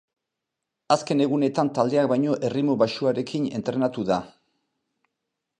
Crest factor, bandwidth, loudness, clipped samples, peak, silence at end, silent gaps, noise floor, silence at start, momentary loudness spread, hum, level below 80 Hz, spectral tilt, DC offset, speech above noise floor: 20 dB; 10 kHz; -24 LUFS; under 0.1%; -4 dBFS; 1.3 s; none; -84 dBFS; 0.9 s; 5 LU; none; -66 dBFS; -6.5 dB/octave; under 0.1%; 61 dB